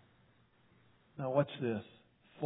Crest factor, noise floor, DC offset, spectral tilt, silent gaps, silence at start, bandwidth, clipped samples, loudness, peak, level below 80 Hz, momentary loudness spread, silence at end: 22 dB; -69 dBFS; under 0.1%; -5.5 dB/octave; none; 1.15 s; 3.9 kHz; under 0.1%; -37 LUFS; -18 dBFS; -80 dBFS; 21 LU; 0 s